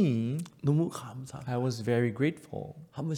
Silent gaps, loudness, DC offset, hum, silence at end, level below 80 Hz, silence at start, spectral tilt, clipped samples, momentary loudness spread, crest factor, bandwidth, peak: none; -31 LUFS; under 0.1%; none; 0 s; -66 dBFS; 0 s; -7.5 dB/octave; under 0.1%; 13 LU; 16 dB; 16 kHz; -16 dBFS